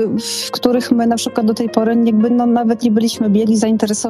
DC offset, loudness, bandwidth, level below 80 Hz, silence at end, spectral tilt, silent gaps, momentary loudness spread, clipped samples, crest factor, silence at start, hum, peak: under 0.1%; -15 LUFS; 13.5 kHz; -56 dBFS; 0 s; -5 dB/octave; none; 4 LU; under 0.1%; 14 dB; 0 s; none; 0 dBFS